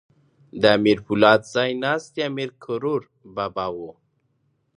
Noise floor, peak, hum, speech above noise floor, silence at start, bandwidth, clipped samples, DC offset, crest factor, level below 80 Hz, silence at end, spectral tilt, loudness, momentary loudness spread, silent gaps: -68 dBFS; -2 dBFS; none; 47 dB; 0.55 s; 10.5 kHz; under 0.1%; under 0.1%; 22 dB; -60 dBFS; 0.85 s; -5.5 dB/octave; -21 LUFS; 16 LU; none